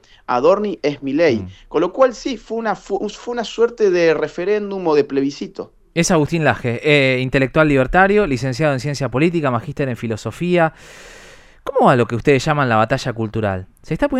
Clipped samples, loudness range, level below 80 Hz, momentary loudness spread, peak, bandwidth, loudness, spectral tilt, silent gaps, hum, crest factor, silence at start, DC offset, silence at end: under 0.1%; 4 LU; -42 dBFS; 10 LU; 0 dBFS; 13.5 kHz; -17 LUFS; -6 dB/octave; none; none; 18 dB; 0.3 s; under 0.1%; 0 s